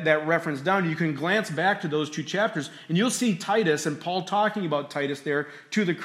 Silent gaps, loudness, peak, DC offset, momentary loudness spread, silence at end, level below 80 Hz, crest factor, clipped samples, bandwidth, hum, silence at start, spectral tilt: none; -26 LUFS; -6 dBFS; under 0.1%; 6 LU; 0 s; -76 dBFS; 18 dB; under 0.1%; 16 kHz; none; 0 s; -4.5 dB/octave